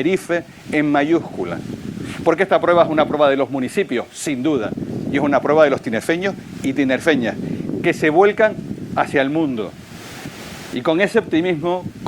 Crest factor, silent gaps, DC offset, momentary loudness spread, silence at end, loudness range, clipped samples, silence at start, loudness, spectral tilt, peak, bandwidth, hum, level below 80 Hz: 18 dB; none; under 0.1%; 14 LU; 0 s; 2 LU; under 0.1%; 0 s; -18 LUFS; -5.5 dB/octave; 0 dBFS; 19.5 kHz; none; -54 dBFS